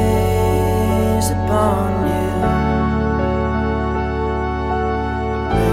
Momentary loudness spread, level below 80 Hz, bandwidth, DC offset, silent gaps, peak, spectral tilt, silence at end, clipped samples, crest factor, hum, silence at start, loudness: 4 LU; -26 dBFS; 16 kHz; under 0.1%; none; -4 dBFS; -7 dB/octave; 0 s; under 0.1%; 14 dB; none; 0 s; -18 LUFS